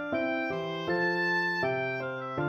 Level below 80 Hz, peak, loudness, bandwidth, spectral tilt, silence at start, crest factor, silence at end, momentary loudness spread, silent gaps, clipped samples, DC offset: -66 dBFS; -18 dBFS; -30 LUFS; 14.5 kHz; -6.5 dB/octave; 0 s; 14 dB; 0 s; 6 LU; none; under 0.1%; under 0.1%